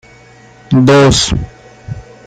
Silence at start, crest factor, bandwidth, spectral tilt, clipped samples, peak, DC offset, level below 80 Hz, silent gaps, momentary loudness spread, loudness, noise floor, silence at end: 0.7 s; 12 dB; 10.5 kHz; -5 dB/octave; under 0.1%; 0 dBFS; under 0.1%; -30 dBFS; none; 22 LU; -10 LUFS; -40 dBFS; 0.25 s